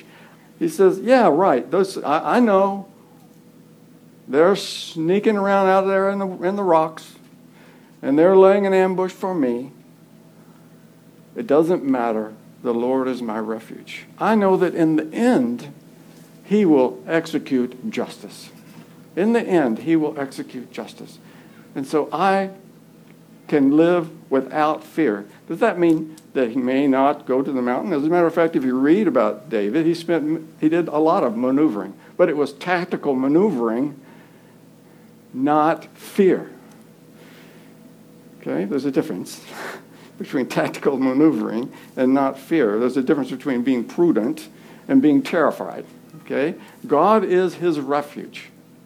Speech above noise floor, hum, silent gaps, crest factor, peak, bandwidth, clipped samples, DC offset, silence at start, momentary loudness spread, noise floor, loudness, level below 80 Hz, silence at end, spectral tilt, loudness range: 29 dB; none; none; 18 dB; -2 dBFS; 16 kHz; under 0.1%; under 0.1%; 0.6 s; 17 LU; -48 dBFS; -19 LUFS; -76 dBFS; 0.4 s; -6.5 dB/octave; 5 LU